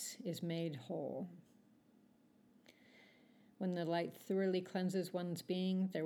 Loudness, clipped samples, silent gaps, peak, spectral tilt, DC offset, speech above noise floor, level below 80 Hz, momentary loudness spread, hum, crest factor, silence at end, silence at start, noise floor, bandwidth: -41 LUFS; under 0.1%; none; -26 dBFS; -6 dB/octave; under 0.1%; 30 dB; under -90 dBFS; 7 LU; none; 16 dB; 0 s; 0 s; -70 dBFS; 17.5 kHz